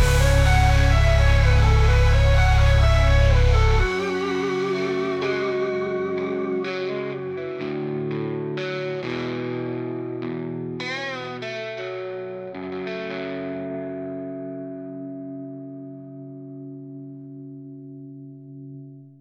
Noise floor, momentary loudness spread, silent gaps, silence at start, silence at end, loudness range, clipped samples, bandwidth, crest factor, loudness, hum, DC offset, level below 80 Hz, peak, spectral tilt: -41 dBFS; 21 LU; none; 0 s; 0.15 s; 18 LU; under 0.1%; 13.5 kHz; 14 dB; -23 LUFS; none; under 0.1%; -26 dBFS; -6 dBFS; -6 dB/octave